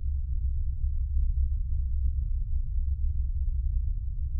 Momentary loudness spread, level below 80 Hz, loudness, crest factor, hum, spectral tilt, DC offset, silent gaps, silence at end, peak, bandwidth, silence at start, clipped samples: 3 LU; -28 dBFS; -32 LUFS; 10 dB; none; -12.5 dB/octave; under 0.1%; none; 0 s; -16 dBFS; 0.3 kHz; 0 s; under 0.1%